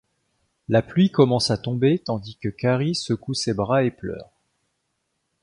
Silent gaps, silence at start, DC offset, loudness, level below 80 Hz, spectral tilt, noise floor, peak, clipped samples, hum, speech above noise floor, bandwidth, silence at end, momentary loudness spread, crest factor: none; 0.7 s; under 0.1%; -22 LUFS; -54 dBFS; -6 dB/octave; -75 dBFS; -4 dBFS; under 0.1%; none; 53 dB; 11.5 kHz; 1.2 s; 14 LU; 20 dB